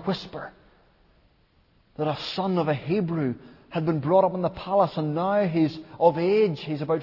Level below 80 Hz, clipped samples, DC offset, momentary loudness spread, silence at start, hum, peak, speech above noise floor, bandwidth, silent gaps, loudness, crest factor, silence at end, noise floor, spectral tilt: -60 dBFS; under 0.1%; under 0.1%; 10 LU; 0 s; none; -6 dBFS; 38 dB; 6 kHz; none; -25 LUFS; 20 dB; 0 s; -62 dBFS; -8.5 dB/octave